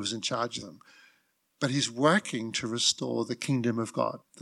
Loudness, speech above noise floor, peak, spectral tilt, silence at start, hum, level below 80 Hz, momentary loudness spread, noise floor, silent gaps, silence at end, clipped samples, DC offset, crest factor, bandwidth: -29 LUFS; 41 dB; -12 dBFS; -3.5 dB/octave; 0 s; none; -74 dBFS; 9 LU; -70 dBFS; none; 0 s; under 0.1%; under 0.1%; 20 dB; 13 kHz